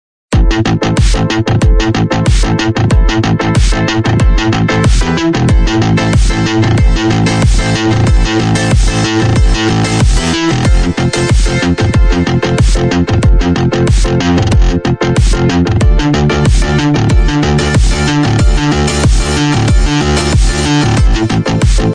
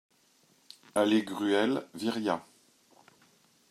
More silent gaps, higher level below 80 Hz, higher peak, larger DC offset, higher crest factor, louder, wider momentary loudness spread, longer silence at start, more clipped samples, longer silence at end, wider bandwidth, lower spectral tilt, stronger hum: neither; first, -12 dBFS vs -82 dBFS; first, 0 dBFS vs -14 dBFS; neither; second, 8 dB vs 20 dB; first, -11 LUFS vs -30 LUFS; second, 2 LU vs 8 LU; second, 0.3 s vs 0.95 s; neither; second, 0 s vs 1.3 s; second, 10 kHz vs 14 kHz; about the same, -5.5 dB/octave vs -4.5 dB/octave; neither